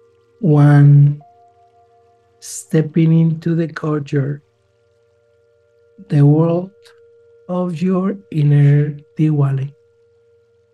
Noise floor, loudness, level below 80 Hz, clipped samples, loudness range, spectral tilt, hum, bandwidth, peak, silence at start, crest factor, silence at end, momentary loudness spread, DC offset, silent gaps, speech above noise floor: -58 dBFS; -15 LUFS; -62 dBFS; under 0.1%; 5 LU; -8.5 dB/octave; none; 10.5 kHz; -2 dBFS; 0.4 s; 16 dB; 1.05 s; 16 LU; under 0.1%; none; 45 dB